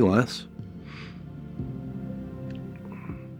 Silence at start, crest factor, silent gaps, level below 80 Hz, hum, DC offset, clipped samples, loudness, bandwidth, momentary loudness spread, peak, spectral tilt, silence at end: 0 s; 26 dB; none; -50 dBFS; none; under 0.1%; under 0.1%; -33 LUFS; 15.5 kHz; 13 LU; -4 dBFS; -7 dB/octave; 0 s